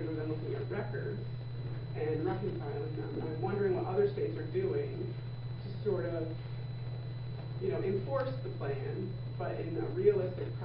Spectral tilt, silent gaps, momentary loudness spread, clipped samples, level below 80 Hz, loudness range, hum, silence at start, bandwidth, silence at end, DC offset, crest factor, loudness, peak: -7.5 dB/octave; none; 9 LU; under 0.1%; -56 dBFS; 3 LU; none; 0 s; 5.2 kHz; 0 s; under 0.1%; 20 dB; -36 LUFS; -16 dBFS